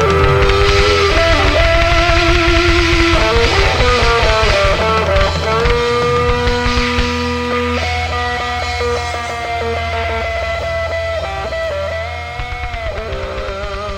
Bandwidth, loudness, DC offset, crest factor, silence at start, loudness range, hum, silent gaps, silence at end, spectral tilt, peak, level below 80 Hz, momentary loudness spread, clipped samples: 14.5 kHz; -14 LUFS; under 0.1%; 12 dB; 0 s; 8 LU; none; none; 0 s; -4.5 dB/octave; -2 dBFS; -20 dBFS; 11 LU; under 0.1%